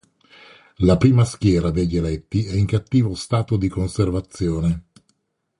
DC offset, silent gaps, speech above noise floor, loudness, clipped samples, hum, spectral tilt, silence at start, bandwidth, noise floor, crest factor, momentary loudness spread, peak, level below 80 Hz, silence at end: under 0.1%; none; 49 dB; -20 LUFS; under 0.1%; none; -7.5 dB/octave; 0.8 s; 11.5 kHz; -68 dBFS; 18 dB; 8 LU; -2 dBFS; -36 dBFS; 0.8 s